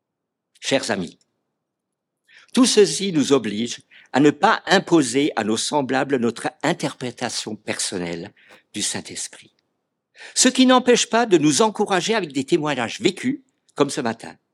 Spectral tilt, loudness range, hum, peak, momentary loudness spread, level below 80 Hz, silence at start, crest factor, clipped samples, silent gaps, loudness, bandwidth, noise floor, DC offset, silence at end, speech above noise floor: -3.5 dB/octave; 8 LU; none; 0 dBFS; 15 LU; -72 dBFS; 0.6 s; 20 dB; under 0.1%; none; -20 LUFS; 15 kHz; -81 dBFS; under 0.1%; 0.2 s; 61 dB